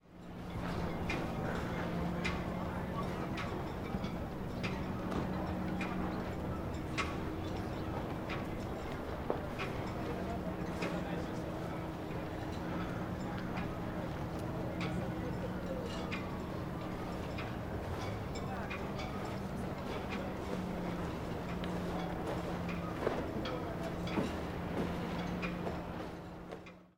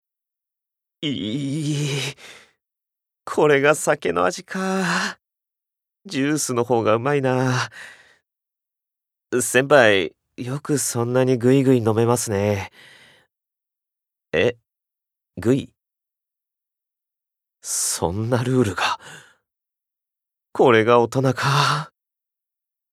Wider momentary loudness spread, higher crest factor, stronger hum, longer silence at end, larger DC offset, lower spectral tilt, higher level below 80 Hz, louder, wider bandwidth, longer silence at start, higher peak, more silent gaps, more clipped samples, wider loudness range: second, 4 LU vs 14 LU; about the same, 22 dB vs 22 dB; neither; second, 0.05 s vs 1.05 s; neither; first, -6.5 dB/octave vs -4.5 dB/octave; first, -50 dBFS vs -64 dBFS; second, -39 LUFS vs -20 LUFS; about the same, 16 kHz vs 15.5 kHz; second, 0.05 s vs 1 s; second, -18 dBFS vs 0 dBFS; neither; neither; second, 2 LU vs 8 LU